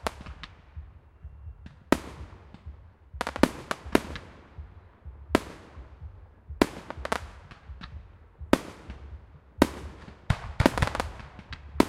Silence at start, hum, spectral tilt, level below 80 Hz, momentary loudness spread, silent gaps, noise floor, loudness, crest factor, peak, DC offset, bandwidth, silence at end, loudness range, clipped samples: 0 s; none; -5.5 dB/octave; -42 dBFS; 22 LU; none; -48 dBFS; -29 LUFS; 32 dB; 0 dBFS; under 0.1%; 16 kHz; 0 s; 4 LU; under 0.1%